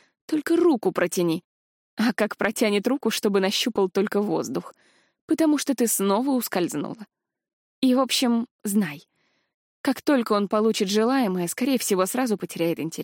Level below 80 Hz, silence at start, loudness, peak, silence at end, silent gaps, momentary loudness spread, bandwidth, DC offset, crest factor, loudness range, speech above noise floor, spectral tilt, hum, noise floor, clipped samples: -72 dBFS; 0.3 s; -23 LUFS; -8 dBFS; 0 s; 1.44-1.97 s, 5.21-5.28 s, 7.53-7.82 s, 8.51-8.59 s, 9.54-9.84 s; 7 LU; 17 kHz; under 0.1%; 16 dB; 2 LU; over 67 dB; -4 dB/octave; none; under -90 dBFS; under 0.1%